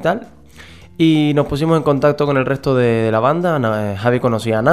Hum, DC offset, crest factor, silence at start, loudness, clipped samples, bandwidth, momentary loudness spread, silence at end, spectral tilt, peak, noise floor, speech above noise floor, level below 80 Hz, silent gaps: none; 0.4%; 16 dB; 0 s; -16 LUFS; under 0.1%; 14.5 kHz; 5 LU; 0 s; -7.5 dB/octave; 0 dBFS; -40 dBFS; 25 dB; -44 dBFS; none